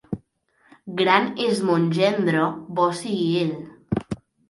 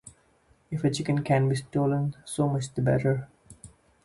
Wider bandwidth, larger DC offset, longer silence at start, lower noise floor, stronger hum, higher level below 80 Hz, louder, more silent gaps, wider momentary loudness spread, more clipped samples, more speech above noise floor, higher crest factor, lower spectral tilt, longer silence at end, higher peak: about the same, 11.5 kHz vs 11.5 kHz; neither; about the same, 0.1 s vs 0.05 s; about the same, -63 dBFS vs -64 dBFS; neither; about the same, -54 dBFS vs -56 dBFS; first, -22 LUFS vs -27 LUFS; neither; first, 15 LU vs 7 LU; neither; first, 42 dB vs 38 dB; about the same, 20 dB vs 18 dB; about the same, -6 dB/octave vs -6.5 dB/octave; about the same, 0.35 s vs 0.35 s; first, -2 dBFS vs -10 dBFS